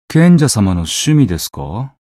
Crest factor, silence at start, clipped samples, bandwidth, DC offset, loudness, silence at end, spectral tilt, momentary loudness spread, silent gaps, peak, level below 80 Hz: 12 dB; 0.1 s; under 0.1%; 15 kHz; under 0.1%; -12 LUFS; 0.25 s; -5.5 dB/octave; 15 LU; none; 0 dBFS; -36 dBFS